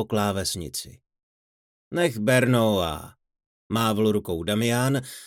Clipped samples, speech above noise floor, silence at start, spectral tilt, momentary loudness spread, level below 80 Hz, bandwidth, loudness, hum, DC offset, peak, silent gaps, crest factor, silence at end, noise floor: under 0.1%; over 66 dB; 0 s; -5 dB/octave; 12 LU; -54 dBFS; 18 kHz; -24 LUFS; none; under 0.1%; -8 dBFS; 1.23-1.91 s, 3.46-3.70 s; 18 dB; 0 s; under -90 dBFS